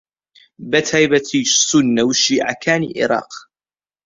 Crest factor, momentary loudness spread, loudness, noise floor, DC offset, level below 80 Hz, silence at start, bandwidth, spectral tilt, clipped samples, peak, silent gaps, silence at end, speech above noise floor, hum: 16 dB; 9 LU; -15 LUFS; under -90 dBFS; under 0.1%; -58 dBFS; 0.6 s; 7.8 kHz; -3 dB/octave; under 0.1%; -2 dBFS; none; 0.65 s; over 74 dB; none